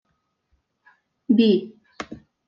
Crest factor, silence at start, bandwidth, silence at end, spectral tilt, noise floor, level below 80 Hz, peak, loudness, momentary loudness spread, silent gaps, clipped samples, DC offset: 18 dB; 1.3 s; 7.2 kHz; 0.3 s; -7.5 dB/octave; -72 dBFS; -66 dBFS; -6 dBFS; -20 LUFS; 24 LU; none; under 0.1%; under 0.1%